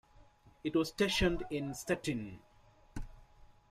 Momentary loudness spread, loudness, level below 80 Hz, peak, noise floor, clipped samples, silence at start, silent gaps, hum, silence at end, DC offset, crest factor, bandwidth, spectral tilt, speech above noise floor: 20 LU; -35 LUFS; -50 dBFS; -18 dBFS; -62 dBFS; under 0.1%; 0.2 s; none; none; 0.25 s; under 0.1%; 18 dB; 15 kHz; -4.5 dB/octave; 27 dB